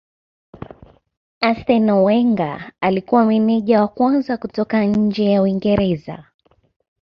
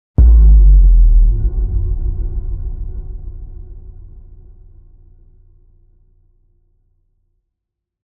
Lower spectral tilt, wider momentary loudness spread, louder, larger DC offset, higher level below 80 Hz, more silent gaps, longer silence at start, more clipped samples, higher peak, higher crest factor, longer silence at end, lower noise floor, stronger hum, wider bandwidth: second, -9 dB/octave vs -13.5 dB/octave; second, 11 LU vs 25 LU; second, -17 LUFS vs -14 LUFS; neither; second, -48 dBFS vs -14 dBFS; neither; first, 1.4 s vs 0.2 s; neither; about the same, -2 dBFS vs -2 dBFS; about the same, 16 dB vs 12 dB; second, 0.8 s vs 4.15 s; second, -44 dBFS vs -80 dBFS; neither; first, 5.6 kHz vs 1.1 kHz